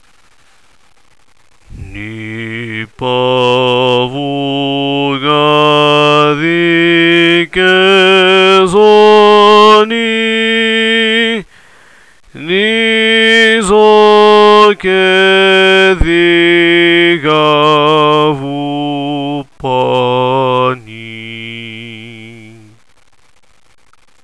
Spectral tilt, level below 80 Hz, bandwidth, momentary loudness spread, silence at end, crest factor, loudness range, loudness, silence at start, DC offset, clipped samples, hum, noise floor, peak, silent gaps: -5 dB/octave; -34 dBFS; 11 kHz; 17 LU; 1.8 s; 10 dB; 10 LU; -8 LUFS; 1.7 s; 0.5%; 1%; none; -50 dBFS; 0 dBFS; none